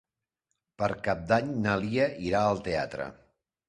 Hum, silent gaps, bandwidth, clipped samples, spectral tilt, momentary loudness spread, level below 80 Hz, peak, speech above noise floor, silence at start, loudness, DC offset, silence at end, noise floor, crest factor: none; none; 10.5 kHz; under 0.1%; -6.5 dB/octave; 7 LU; -54 dBFS; -10 dBFS; 55 dB; 0.8 s; -29 LUFS; under 0.1%; 0.55 s; -83 dBFS; 20 dB